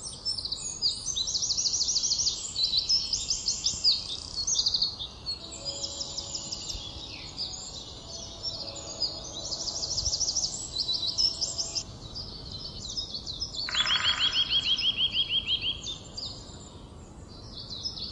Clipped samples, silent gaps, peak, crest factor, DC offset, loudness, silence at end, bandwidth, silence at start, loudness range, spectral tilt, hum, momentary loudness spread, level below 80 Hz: under 0.1%; none; -10 dBFS; 20 dB; under 0.1%; -28 LUFS; 0 s; 12 kHz; 0 s; 9 LU; 0 dB/octave; none; 15 LU; -50 dBFS